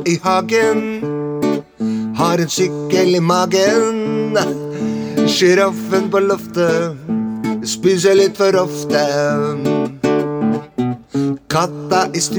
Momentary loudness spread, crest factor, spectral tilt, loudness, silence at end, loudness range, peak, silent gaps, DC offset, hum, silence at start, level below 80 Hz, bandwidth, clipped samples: 8 LU; 14 dB; -5 dB/octave; -16 LUFS; 0 s; 2 LU; -2 dBFS; none; under 0.1%; none; 0 s; -56 dBFS; over 20 kHz; under 0.1%